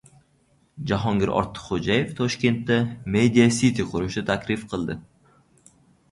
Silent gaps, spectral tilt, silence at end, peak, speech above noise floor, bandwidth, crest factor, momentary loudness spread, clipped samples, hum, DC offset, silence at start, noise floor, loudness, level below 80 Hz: none; -5.5 dB/octave; 1.1 s; -4 dBFS; 40 dB; 11.5 kHz; 20 dB; 11 LU; under 0.1%; none; under 0.1%; 0.75 s; -63 dBFS; -23 LUFS; -48 dBFS